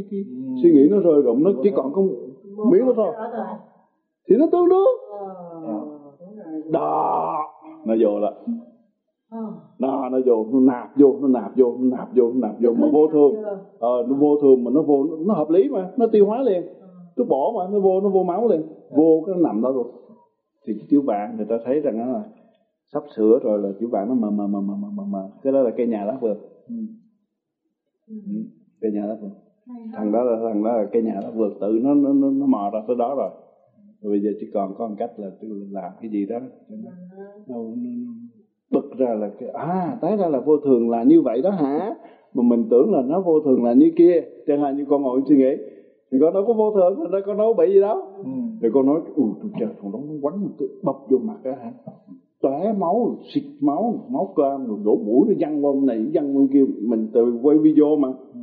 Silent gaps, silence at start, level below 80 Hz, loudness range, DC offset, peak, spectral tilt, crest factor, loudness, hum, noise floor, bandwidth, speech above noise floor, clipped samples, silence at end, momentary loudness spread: none; 0 s; -76 dBFS; 10 LU; under 0.1%; -2 dBFS; -9 dB/octave; 18 dB; -20 LUFS; none; -77 dBFS; 4.4 kHz; 58 dB; under 0.1%; 0 s; 17 LU